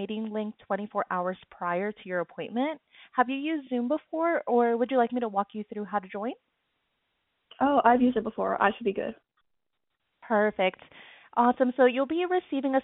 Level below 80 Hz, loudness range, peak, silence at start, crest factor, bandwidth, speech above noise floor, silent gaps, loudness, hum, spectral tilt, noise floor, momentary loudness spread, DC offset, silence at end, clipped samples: -68 dBFS; 4 LU; -6 dBFS; 0 s; 22 dB; 4 kHz; 55 dB; none; -28 LUFS; none; -4 dB/octave; -82 dBFS; 12 LU; under 0.1%; 0 s; under 0.1%